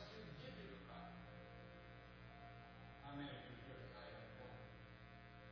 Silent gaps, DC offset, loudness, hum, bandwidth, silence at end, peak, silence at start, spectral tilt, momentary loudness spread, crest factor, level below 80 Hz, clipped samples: none; under 0.1%; -57 LUFS; 60 Hz at -65 dBFS; 5.4 kHz; 0 s; -40 dBFS; 0 s; -4.5 dB/octave; 7 LU; 16 dB; -68 dBFS; under 0.1%